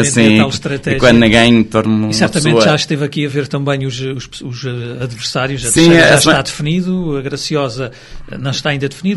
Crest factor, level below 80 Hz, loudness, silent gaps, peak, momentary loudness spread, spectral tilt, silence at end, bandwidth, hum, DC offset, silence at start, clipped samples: 12 dB; -36 dBFS; -12 LUFS; none; 0 dBFS; 15 LU; -4.5 dB/octave; 0 s; 12 kHz; none; under 0.1%; 0 s; 0.3%